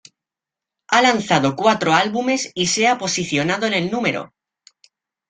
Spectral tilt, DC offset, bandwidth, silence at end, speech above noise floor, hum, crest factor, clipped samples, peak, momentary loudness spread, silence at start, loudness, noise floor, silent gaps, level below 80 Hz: -3.5 dB/octave; under 0.1%; 9.6 kHz; 1.05 s; 69 dB; none; 18 dB; under 0.1%; -2 dBFS; 6 LU; 0.9 s; -18 LUFS; -87 dBFS; none; -60 dBFS